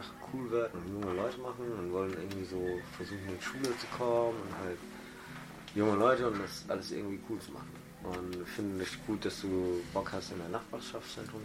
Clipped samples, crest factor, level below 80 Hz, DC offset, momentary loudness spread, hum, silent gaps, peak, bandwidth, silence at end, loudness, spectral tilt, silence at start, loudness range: under 0.1%; 22 dB; -62 dBFS; under 0.1%; 12 LU; none; none; -14 dBFS; 16.5 kHz; 0 s; -36 LUFS; -5.5 dB/octave; 0 s; 4 LU